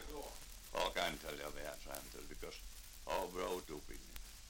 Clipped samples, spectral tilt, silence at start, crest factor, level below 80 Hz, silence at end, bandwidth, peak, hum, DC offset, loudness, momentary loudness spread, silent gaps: under 0.1%; -2.5 dB/octave; 0 s; 24 dB; -56 dBFS; 0 s; 17 kHz; -20 dBFS; none; under 0.1%; -45 LUFS; 13 LU; none